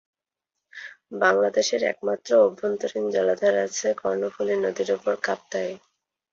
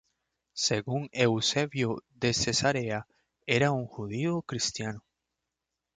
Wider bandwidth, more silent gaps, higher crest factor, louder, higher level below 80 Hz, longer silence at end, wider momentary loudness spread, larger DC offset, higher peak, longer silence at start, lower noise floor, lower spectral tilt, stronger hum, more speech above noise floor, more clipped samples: second, 7.8 kHz vs 9.6 kHz; neither; about the same, 18 dB vs 20 dB; first, -24 LUFS vs -29 LUFS; second, -70 dBFS vs -60 dBFS; second, 0.55 s vs 1 s; about the same, 13 LU vs 11 LU; neither; first, -6 dBFS vs -10 dBFS; first, 0.75 s vs 0.55 s; about the same, -85 dBFS vs -86 dBFS; about the same, -3 dB/octave vs -4 dB/octave; neither; first, 62 dB vs 57 dB; neither